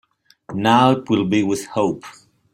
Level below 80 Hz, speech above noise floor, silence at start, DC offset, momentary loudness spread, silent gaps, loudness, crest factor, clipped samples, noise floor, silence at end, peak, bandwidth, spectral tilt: -58 dBFS; 24 dB; 0.5 s; under 0.1%; 11 LU; none; -18 LUFS; 18 dB; under 0.1%; -42 dBFS; 0.4 s; -2 dBFS; 15.5 kHz; -5.5 dB/octave